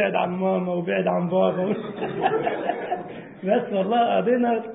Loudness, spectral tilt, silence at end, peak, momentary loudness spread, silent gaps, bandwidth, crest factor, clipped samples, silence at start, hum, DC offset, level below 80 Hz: -24 LUFS; -11 dB/octave; 0 s; -8 dBFS; 9 LU; none; 4 kHz; 14 dB; under 0.1%; 0 s; none; under 0.1%; -66 dBFS